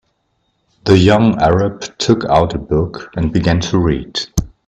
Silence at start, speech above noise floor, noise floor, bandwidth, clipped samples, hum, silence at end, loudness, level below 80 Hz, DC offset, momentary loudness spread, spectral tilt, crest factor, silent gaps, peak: 0.85 s; 51 dB; -65 dBFS; 13 kHz; under 0.1%; none; 0.2 s; -15 LUFS; -32 dBFS; under 0.1%; 10 LU; -6 dB/octave; 14 dB; none; 0 dBFS